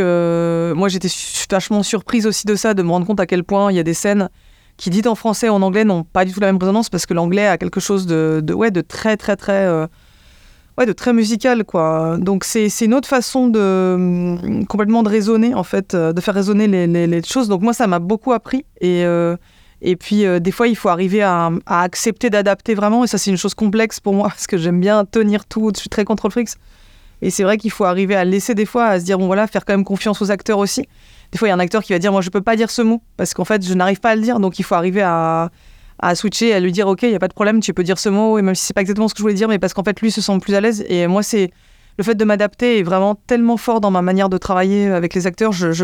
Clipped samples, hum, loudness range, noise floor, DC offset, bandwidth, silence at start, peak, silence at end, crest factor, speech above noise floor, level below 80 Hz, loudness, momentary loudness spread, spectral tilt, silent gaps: under 0.1%; none; 2 LU; -46 dBFS; under 0.1%; 17.5 kHz; 0 s; 0 dBFS; 0 s; 16 dB; 30 dB; -48 dBFS; -16 LUFS; 5 LU; -5.5 dB/octave; none